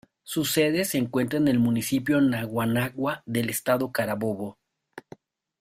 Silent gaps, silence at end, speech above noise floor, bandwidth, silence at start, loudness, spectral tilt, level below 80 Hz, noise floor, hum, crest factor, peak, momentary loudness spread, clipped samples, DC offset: none; 0.6 s; 26 dB; 16 kHz; 0.25 s; -25 LUFS; -5 dB/octave; -60 dBFS; -51 dBFS; none; 18 dB; -8 dBFS; 9 LU; under 0.1%; under 0.1%